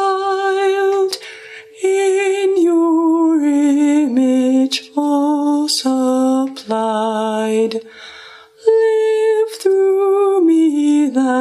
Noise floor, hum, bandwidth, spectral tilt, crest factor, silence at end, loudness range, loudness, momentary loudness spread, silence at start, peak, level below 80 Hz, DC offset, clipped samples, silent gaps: -39 dBFS; none; 14.5 kHz; -4 dB/octave; 14 dB; 0 s; 3 LU; -15 LUFS; 7 LU; 0 s; 0 dBFS; -72 dBFS; under 0.1%; under 0.1%; none